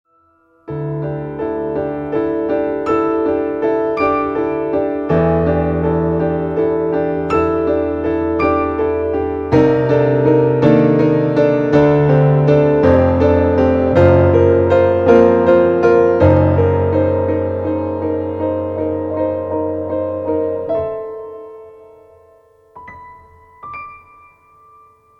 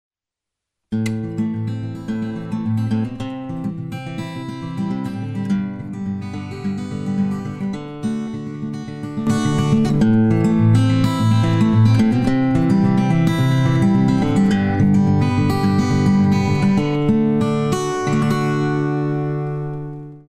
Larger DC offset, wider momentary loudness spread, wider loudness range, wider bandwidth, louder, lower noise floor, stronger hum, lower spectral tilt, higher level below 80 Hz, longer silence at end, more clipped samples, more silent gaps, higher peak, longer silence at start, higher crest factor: neither; about the same, 10 LU vs 12 LU; about the same, 10 LU vs 10 LU; second, 6.6 kHz vs 13.5 kHz; first, -15 LUFS vs -19 LUFS; second, -55 dBFS vs -86 dBFS; neither; first, -10 dB/octave vs -7.5 dB/octave; first, -36 dBFS vs -42 dBFS; first, 1.25 s vs 0.1 s; neither; neither; first, 0 dBFS vs -4 dBFS; second, 0.7 s vs 0.9 s; about the same, 14 dB vs 14 dB